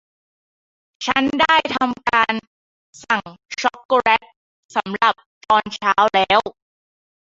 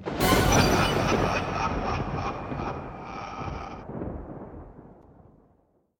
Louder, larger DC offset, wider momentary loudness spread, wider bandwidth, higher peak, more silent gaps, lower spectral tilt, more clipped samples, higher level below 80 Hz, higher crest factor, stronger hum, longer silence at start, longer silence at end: first, -18 LUFS vs -26 LUFS; neither; second, 10 LU vs 19 LU; second, 7.8 kHz vs 17.5 kHz; first, -2 dBFS vs -6 dBFS; first, 2.47-2.93 s, 3.85-3.89 s, 4.36-4.69 s, 5.26-5.41 s vs none; second, -3 dB/octave vs -4.5 dB/octave; neither; second, -56 dBFS vs -40 dBFS; about the same, 18 dB vs 22 dB; neither; first, 1 s vs 0 s; second, 0.7 s vs 1.05 s